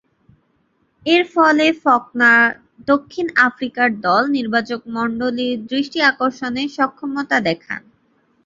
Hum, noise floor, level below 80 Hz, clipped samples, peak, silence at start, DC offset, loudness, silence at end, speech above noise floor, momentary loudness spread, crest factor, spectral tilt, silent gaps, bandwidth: none; -63 dBFS; -60 dBFS; under 0.1%; 0 dBFS; 1.05 s; under 0.1%; -17 LUFS; 0.65 s; 46 dB; 10 LU; 18 dB; -4.5 dB/octave; none; 7.8 kHz